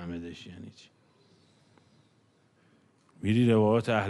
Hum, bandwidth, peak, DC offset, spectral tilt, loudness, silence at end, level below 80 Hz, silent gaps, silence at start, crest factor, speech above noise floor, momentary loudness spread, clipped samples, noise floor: none; 11.5 kHz; -12 dBFS; under 0.1%; -7.5 dB/octave; -26 LUFS; 0 s; -66 dBFS; none; 0 s; 18 dB; 40 dB; 24 LU; under 0.1%; -66 dBFS